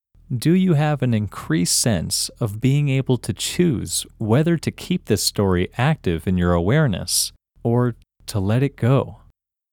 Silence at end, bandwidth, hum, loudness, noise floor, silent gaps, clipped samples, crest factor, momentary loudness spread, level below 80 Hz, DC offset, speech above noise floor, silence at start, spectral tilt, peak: 0.55 s; 18.5 kHz; none; -20 LUFS; -57 dBFS; none; under 0.1%; 16 dB; 7 LU; -44 dBFS; under 0.1%; 37 dB; 0.3 s; -5 dB/octave; -4 dBFS